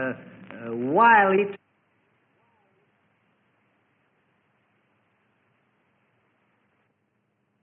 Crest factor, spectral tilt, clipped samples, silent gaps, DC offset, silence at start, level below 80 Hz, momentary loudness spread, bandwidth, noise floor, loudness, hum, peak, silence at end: 22 dB; -9.5 dB/octave; under 0.1%; none; under 0.1%; 0 s; -74 dBFS; 26 LU; 4.1 kHz; -73 dBFS; -20 LUFS; none; -6 dBFS; 6.05 s